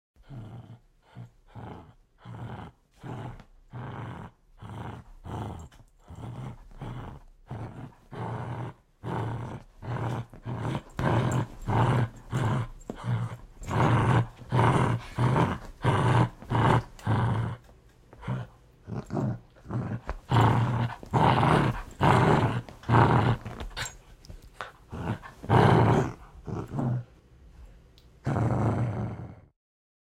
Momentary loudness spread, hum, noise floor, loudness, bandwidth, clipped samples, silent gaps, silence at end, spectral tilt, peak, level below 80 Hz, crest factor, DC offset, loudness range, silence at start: 22 LU; none; -55 dBFS; -27 LUFS; 11 kHz; under 0.1%; none; 0.75 s; -7 dB/octave; -6 dBFS; -46 dBFS; 24 dB; under 0.1%; 17 LU; 0.3 s